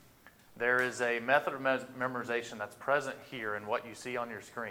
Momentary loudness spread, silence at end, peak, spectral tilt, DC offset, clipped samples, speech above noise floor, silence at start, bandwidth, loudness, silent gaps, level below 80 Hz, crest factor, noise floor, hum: 11 LU; 0 s; -12 dBFS; -4 dB/octave; under 0.1%; under 0.1%; 26 dB; 0.25 s; 18 kHz; -33 LUFS; none; -76 dBFS; 22 dB; -60 dBFS; none